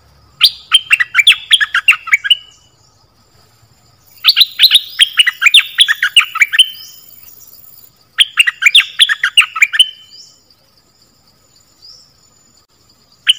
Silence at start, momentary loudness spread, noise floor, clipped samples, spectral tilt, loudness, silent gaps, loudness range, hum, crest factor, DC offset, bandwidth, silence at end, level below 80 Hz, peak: 0.4 s; 5 LU; -51 dBFS; 2%; 4.5 dB/octave; -8 LUFS; none; 5 LU; none; 14 dB; under 0.1%; over 20 kHz; 0.05 s; -60 dBFS; 0 dBFS